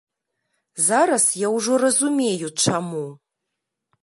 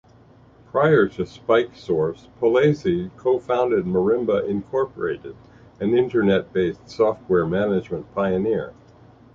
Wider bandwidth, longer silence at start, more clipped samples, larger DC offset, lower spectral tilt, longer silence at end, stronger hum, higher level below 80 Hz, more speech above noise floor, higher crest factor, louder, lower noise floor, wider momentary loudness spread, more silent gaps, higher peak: first, 12 kHz vs 7.4 kHz; about the same, 0.75 s vs 0.75 s; neither; neither; second, -3 dB/octave vs -8 dB/octave; first, 0.85 s vs 0.65 s; neither; second, -72 dBFS vs -52 dBFS; first, 61 dB vs 30 dB; about the same, 18 dB vs 18 dB; first, -19 LUFS vs -22 LUFS; first, -81 dBFS vs -51 dBFS; first, 13 LU vs 9 LU; neither; about the same, -4 dBFS vs -4 dBFS